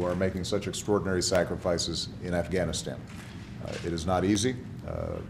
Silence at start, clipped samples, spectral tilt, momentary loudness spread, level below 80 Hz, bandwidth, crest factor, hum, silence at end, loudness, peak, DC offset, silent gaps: 0 s; under 0.1%; -4.5 dB/octave; 13 LU; -48 dBFS; 14.5 kHz; 20 dB; none; 0 s; -29 LUFS; -10 dBFS; under 0.1%; none